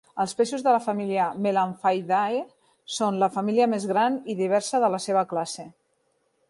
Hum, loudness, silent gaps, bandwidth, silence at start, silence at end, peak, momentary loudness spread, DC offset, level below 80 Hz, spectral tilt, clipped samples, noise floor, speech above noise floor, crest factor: none; -25 LUFS; none; 11.5 kHz; 0.15 s; 0.8 s; -8 dBFS; 7 LU; under 0.1%; -74 dBFS; -5 dB/octave; under 0.1%; -70 dBFS; 46 dB; 18 dB